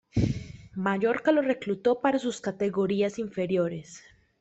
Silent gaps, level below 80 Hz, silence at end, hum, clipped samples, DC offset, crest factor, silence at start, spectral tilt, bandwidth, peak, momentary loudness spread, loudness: none; -50 dBFS; 0.4 s; none; under 0.1%; under 0.1%; 18 dB; 0.15 s; -6.5 dB/octave; 8.4 kHz; -10 dBFS; 9 LU; -27 LUFS